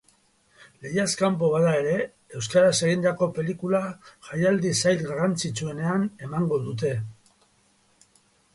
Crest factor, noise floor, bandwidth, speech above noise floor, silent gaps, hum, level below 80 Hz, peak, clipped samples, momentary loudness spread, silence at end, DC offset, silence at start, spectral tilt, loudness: 18 dB; -64 dBFS; 11.5 kHz; 40 dB; none; none; -62 dBFS; -8 dBFS; under 0.1%; 13 LU; 1.4 s; under 0.1%; 0.8 s; -5 dB/octave; -25 LUFS